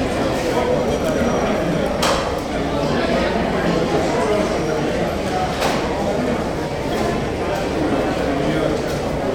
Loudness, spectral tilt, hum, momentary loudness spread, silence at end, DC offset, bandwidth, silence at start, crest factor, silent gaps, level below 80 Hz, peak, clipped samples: -20 LUFS; -5.5 dB/octave; none; 3 LU; 0 s; under 0.1%; over 20 kHz; 0 s; 16 dB; none; -34 dBFS; -4 dBFS; under 0.1%